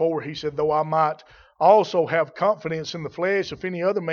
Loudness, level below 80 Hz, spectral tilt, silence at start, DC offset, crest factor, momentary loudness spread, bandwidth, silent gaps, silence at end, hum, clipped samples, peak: -22 LUFS; -60 dBFS; -6 dB/octave; 0 s; under 0.1%; 18 dB; 12 LU; 7 kHz; none; 0 s; none; under 0.1%; -4 dBFS